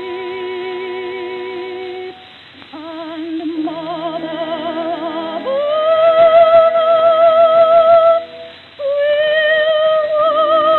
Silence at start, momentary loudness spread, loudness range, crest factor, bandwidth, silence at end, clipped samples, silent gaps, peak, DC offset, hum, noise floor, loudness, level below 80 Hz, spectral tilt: 0 s; 18 LU; 14 LU; 14 dB; 4.3 kHz; 0 s; under 0.1%; none; 0 dBFS; under 0.1%; none; -39 dBFS; -14 LUFS; -62 dBFS; -6.5 dB/octave